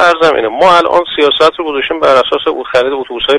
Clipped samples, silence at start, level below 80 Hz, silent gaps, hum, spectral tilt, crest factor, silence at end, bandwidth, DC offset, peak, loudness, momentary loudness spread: 0.5%; 0 s; -44 dBFS; none; none; -3.5 dB/octave; 10 dB; 0 s; 11.5 kHz; under 0.1%; 0 dBFS; -10 LUFS; 7 LU